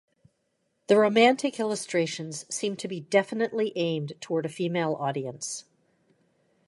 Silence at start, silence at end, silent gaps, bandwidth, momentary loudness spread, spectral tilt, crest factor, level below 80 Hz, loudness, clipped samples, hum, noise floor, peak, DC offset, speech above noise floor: 0.9 s; 1.05 s; none; 11.5 kHz; 13 LU; -4.5 dB/octave; 22 dB; -78 dBFS; -27 LUFS; under 0.1%; none; -75 dBFS; -6 dBFS; under 0.1%; 49 dB